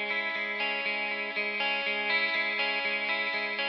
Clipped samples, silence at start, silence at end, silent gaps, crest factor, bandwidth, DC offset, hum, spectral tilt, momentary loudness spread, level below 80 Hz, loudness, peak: under 0.1%; 0 s; 0 s; none; 14 dB; 6.6 kHz; under 0.1%; none; 2 dB/octave; 4 LU; -86 dBFS; -28 LUFS; -16 dBFS